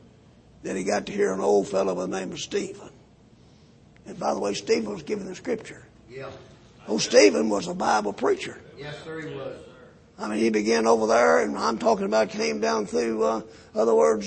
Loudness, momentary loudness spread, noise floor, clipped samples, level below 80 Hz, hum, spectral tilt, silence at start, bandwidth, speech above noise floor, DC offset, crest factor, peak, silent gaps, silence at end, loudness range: -24 LUFS; 19 LU; -54 dBFS; under 0.1%; -60 dBFS; none; -4 dB/octave; 0.65 s; 8.8 kHz; 30 dB; under 0.1%; 22 dB; -4 dBFS; none; 0 s; 8 LU